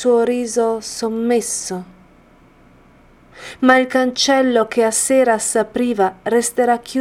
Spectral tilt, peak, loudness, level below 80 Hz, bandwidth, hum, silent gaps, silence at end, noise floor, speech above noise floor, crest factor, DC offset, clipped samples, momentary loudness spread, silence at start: -2.5 dB/octave; 0 dBFS; -17 LUFS; -54 dBFS; 16 kHz; none; none; 0 s; -49 dBFS; 32 dB; 18 dB; under 0.1%; under 0.1%; 9 LU; 0 s